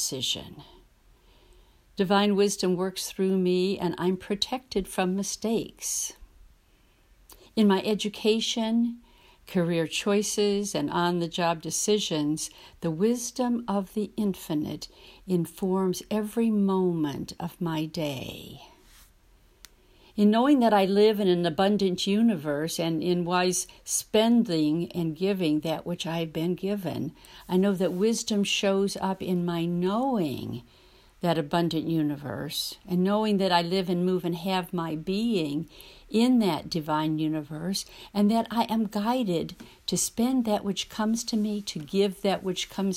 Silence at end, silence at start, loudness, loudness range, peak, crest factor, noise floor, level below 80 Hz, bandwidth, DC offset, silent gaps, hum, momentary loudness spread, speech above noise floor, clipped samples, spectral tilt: 0 s; 0 s; -27 LUFS; 5 LU; -8 dBFS; 18 dB; -61 dBFS; -58 dBFS; 16 kHz; under 0.1%; none; none; 9 LU; 35 dB; under 0.1%; -5 dB/octave